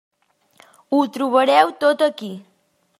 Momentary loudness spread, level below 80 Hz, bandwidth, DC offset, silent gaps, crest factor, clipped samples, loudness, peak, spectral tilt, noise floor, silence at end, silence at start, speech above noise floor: 18 LU; -78 dBFS; 15.5 kHz; under 0.1%; none; 18 dB; under 0.1%; -18 LUFS; -2 dBFS; -4.5 dB/octave; -56 dBFS; 0.6 s; 0.9 s; 39 dB